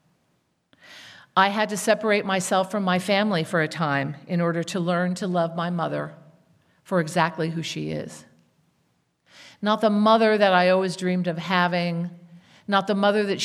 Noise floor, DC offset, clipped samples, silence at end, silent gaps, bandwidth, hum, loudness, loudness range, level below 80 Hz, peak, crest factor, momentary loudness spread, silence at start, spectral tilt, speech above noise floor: -69 dBFS; under 0.1%; under 0.1%; 0 s; none; 14 kHz; none; -23 LUFS; 7 LU; -72 dBFS; -4 dBFS; 20 dB; 12 LU; 0.9 s; -5 dB/octave; 47 dB